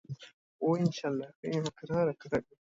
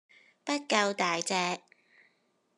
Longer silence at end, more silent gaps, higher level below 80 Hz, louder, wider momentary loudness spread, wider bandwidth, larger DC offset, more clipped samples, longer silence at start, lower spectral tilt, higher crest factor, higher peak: second, 0.3 s vs 1 s; first, 0.34-0.59 s, 1.36-1.43 s vs none; first, -66 dBFS vs -86 dBFS; second, -33 LUFS vs -30 LUFS; second, 7 LU vs 11 LU; second, 7.8 kHz vs 12.5 kHz; neither; neither; second, 0.1 s vs 0.45 s; first, -7 dB/octave vs -2.5 dB/octave; second, 18 dB vs 24 dB; second, -16 dBFS vs -10 dBFS